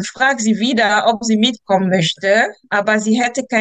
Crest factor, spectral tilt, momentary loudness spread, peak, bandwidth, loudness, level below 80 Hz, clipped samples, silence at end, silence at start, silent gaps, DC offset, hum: 14 dB; -4 dB/octave; 3 LU; -2 dBFS; 9.2 kHz; -15 LUFS; -62 dBFS; under 0.1%; 0 s; 0 s; none; under 0.1%; none